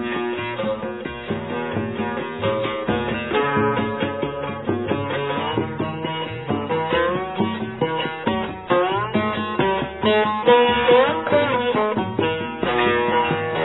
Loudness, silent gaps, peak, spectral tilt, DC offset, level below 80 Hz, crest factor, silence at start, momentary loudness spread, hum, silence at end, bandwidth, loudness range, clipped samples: -21 LUFS; none; -2 dBFS; -9.5 dB/octave; 0.2%; -48 dBFS; 18 dB; 0 s; 10 LU; none; 0 s; 4.1 kHz; 6 LU; under 0.1%